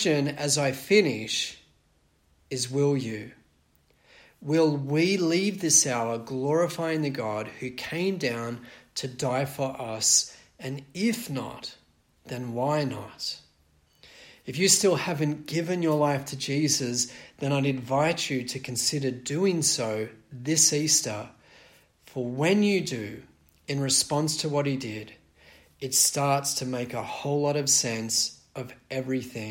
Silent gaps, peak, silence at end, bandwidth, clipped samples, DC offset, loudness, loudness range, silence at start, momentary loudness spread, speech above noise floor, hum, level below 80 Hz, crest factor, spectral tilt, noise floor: none; -6 dBFS; 0 s; 16.5 kHz; under 0.1%; under 0.1%; -26 LUFS; 5 LU; 0 s; 16 LU; 39 dB; none; -66 dBFS; 22 dB; -3.5 dB/octave; -66 dBFS